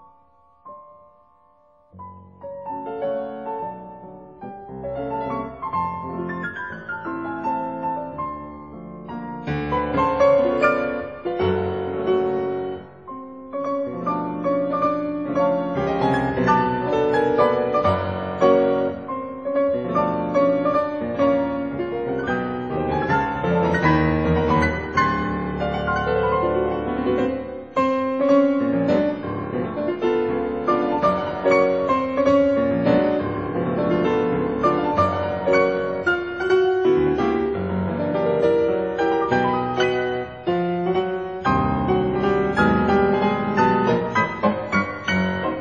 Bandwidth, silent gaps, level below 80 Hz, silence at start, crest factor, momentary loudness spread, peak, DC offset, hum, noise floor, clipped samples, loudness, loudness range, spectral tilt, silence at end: 7.2 kHz; none; -44 dBFS; 0.65 s; 18 dB; 12 LU; -4 dBFS; 0.2%; none; -57 dBFS; under 0.1%; -21 LUFS; 9 LU; -5.5 dB/octave; 0 s